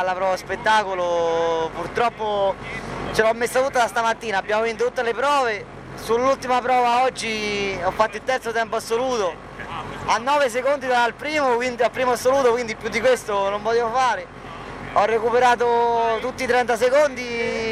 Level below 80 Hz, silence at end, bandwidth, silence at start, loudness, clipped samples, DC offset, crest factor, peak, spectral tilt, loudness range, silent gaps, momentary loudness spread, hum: -48 dBFS; 0 s; 15 kHz; 0 s; -21 LUFS; under 0.1%; under 0.1%; 18 dB; -2 dBFS; -3.5 dB/octave; 2 LU; none; 7 LU; none